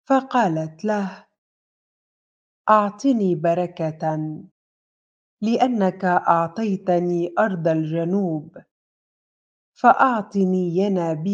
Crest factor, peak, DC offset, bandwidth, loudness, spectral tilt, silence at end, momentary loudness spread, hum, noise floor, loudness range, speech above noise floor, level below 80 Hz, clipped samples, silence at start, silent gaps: 20 dB; -2 dBFS; under 0.1%; 7.6 kHz; -21 LUFS; -7.5 dB/octave; 0 s; 8 LU; none; under -90 dBFS; 2 LU; over 70 dB; -72 dBFS; under 0.1%; 0.1 s; 1.38-2.65 s, 4.51-5.37 s, 8.71-9.73 s